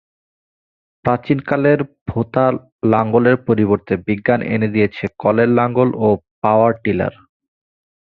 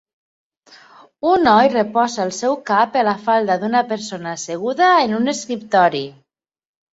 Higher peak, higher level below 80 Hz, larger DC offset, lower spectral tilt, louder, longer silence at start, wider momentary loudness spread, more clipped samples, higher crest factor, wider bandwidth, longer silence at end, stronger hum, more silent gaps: about the same, -2 dBFS vs -2 dBFS; first, -48 dBFS vs -60 dBFS; neither; first, -10.5 dB/octave vs -4 dB/octave; about the same, -17 LUFS vs -17 LUFS; second, 1.05 s vs 1.25 s; second, 6 LU vs 12 LU; neither; about the same, 16 dB vs 16 dB; second, 4.9 kHz vs 8 kHz; first, 1 s vs 0.8 s; neither; first, 2.01-2.06 s, 2.72-2.79 s, 6.31-6.42 s vs none